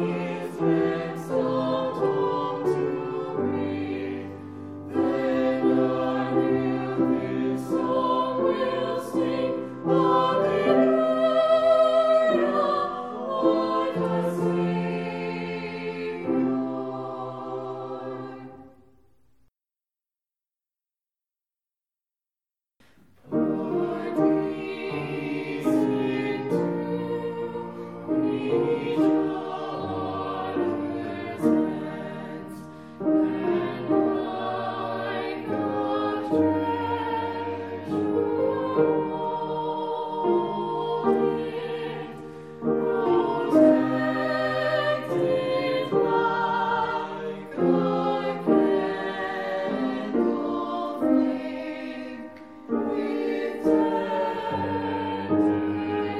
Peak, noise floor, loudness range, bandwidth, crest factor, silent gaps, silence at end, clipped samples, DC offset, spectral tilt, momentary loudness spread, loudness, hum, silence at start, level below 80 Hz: -6 dBFS; under -90 dBFS; 6 LU; 12 kHz; 18 dB; none; 0 s; under 0.1%; 0.1%; -7.5 dB/octave; 11 LU; -25 LUFS; none; 0 s; -66 dBFS